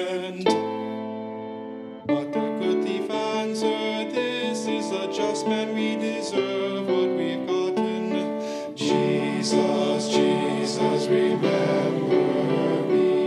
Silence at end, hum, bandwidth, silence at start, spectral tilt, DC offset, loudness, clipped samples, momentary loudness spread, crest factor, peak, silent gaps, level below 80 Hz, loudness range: 0 s; none; 11.5 kHz; 0 s; -5 dB/octave; under 0.1%; -24 LUFS; under 0.1%; 8 LU; 18 dB; -6 dBFS; none; -74 dBFS; 4 LU